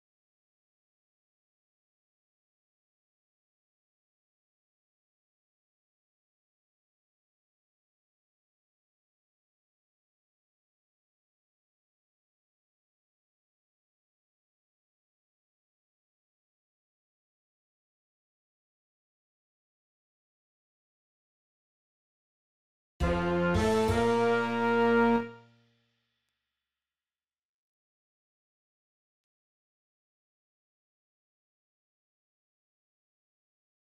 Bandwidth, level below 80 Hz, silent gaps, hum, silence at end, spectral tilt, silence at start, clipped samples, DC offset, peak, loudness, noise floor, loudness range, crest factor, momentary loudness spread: 13.5 kHz; -54 dBFS; none; none; 8.5 s; -6.5 dB/octave; 23 s; under 0.1%; under 0.1%; -14 dBFS; -27 LUFS; under -90 dBFS; 8 LU; 24 dB; 7 LU